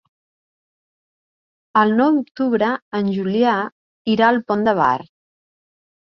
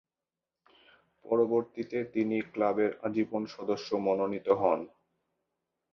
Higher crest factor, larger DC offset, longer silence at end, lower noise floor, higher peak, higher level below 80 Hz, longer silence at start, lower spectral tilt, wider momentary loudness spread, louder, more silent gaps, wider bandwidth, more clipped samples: about the same, 18 dB vs 20 dB; neither; about the same, 1 s vs 1.05 s; about the same, under -90 dBFS vs under -90 dBFS; first, -2 dBFS vs -12 dBFS; first, -62 dBFS vs -72 dBFS; first, 1.75 s vs 1.25 s; about the same, -7.5 dB/octave vs -7 dB/octave; about the same, 7 LU vs 7 LU; first, -18 LUFS vs -31 LUFS; first, 2.82-2.92 s, 3.72-4.05 s vs none; about the same, 6.2 kHz vs 6.6 kHz; neither